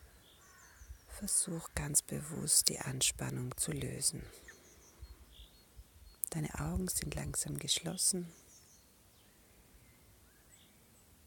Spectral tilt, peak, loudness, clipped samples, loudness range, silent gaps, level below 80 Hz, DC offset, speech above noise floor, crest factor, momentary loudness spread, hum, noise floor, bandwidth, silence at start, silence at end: -2.5 dB/octave; -6 dBFS; -34 LUFS; under 0.1%; 8 LU; none; -56 dBFS; under 0.1%; 28 dB; 32 dB; 26 LU; none; -64 dBFS; 17 kHz; 0 s; 0.7 s